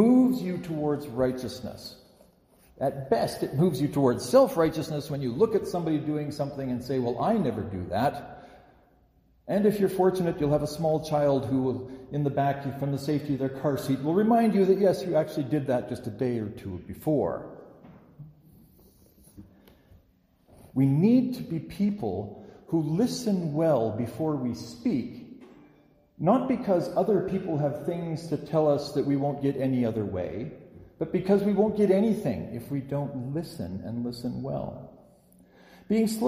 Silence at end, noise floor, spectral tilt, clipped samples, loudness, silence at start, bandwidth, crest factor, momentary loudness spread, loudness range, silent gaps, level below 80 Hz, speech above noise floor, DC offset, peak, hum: 0 s; -64 dBFS; -7.5 dB/octave; under 0.1%; -27 LUFS; 0 s; 15.5 kHz; 18 dB; 12 LU; 6 LU; none; -58 dBFS; 37 dB; under 0.1%; -8 dBFS; none